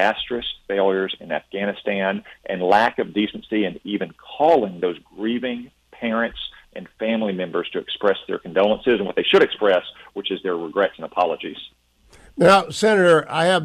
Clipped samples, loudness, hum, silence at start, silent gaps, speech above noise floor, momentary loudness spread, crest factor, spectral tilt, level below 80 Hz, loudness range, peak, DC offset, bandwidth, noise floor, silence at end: under 0.1%; -21 LUFS; none; 0 s; none; 32 dB; 13 LU; 16 dB; -5 dB/octave; -56 dBFS; 4 LU; -4 dBFS; under 0.1%; 12.5 kHz; -52 dBFS; 0 s